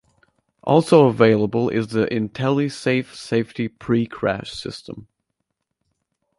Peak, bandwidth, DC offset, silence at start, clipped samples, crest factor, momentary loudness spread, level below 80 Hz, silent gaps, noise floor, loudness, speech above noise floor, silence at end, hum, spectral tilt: -2 dBFS; 11.5 kHz; under 0.1%; 0.65 s; under 0.1%; 18 dB; 17 LU; -56 dBFS; none; -77 dBFS; -20 LUFS; 58 dB; 1.35 s; none; -7 dB/octave